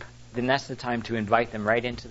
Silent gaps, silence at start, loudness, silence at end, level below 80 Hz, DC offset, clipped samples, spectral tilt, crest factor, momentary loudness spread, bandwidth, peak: none; 0 s; -26 LUFS; 0 s; -52 dBFS; under 0.1%; under 0.1%; -5.5 dB/octave; 20 dB; 7 LU; 8 kHz; -6 dBFS